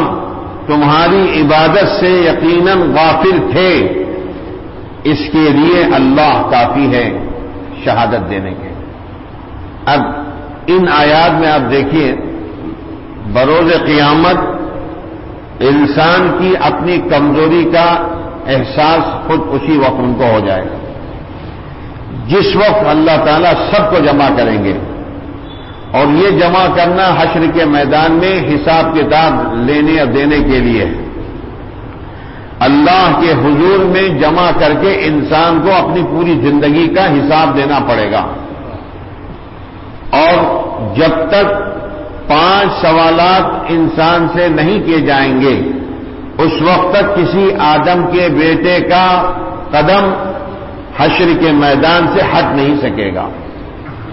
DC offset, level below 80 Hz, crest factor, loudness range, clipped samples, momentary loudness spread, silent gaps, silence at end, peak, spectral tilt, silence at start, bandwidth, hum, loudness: under 0.1%; -32 dBFS; 10 dB; 4 LU; under 0.1%; 18 LU; none; 0 s; 0 dBFS; -10 dB/octave; 0 s; 5.8 kHz; none; -10 LUFS